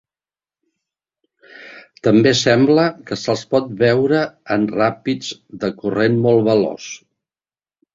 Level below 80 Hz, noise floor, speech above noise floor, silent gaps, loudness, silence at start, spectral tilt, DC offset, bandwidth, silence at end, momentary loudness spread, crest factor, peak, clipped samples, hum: -56 dBFS; under -90 dBFS; over 74 dB; none; -17 LUFS; 1.6 s; -5.5 dB/octave; under 0.1%; 7.8 kHz; 0.95 s; 15 LU; 16 dB; -2 dBFS; under 0.1%; none